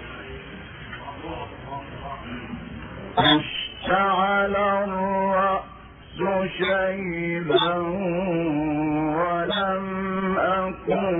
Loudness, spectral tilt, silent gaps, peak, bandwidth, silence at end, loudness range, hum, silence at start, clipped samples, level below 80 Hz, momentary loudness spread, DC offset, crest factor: -23 LUFS; -10 dB/octave; none; -6 dBFS; 4 kHz; 0 s; 4 LU; none; 0 s; under 0.1%; -48 dBFS; 16 LU; under 0.1%; 18 dB